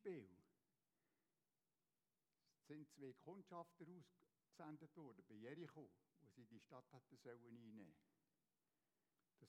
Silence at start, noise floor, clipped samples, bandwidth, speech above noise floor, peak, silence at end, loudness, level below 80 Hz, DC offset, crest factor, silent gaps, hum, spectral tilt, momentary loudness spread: 0 s; under -90 dBFS; under 0.1%; 9 kHz; over 28 dB; -44 dBFS; 0 s; -62 LUFS; under -90 dBFS; under 0.1%; 20 dB; none; none; -7 dB/octave; 8 LU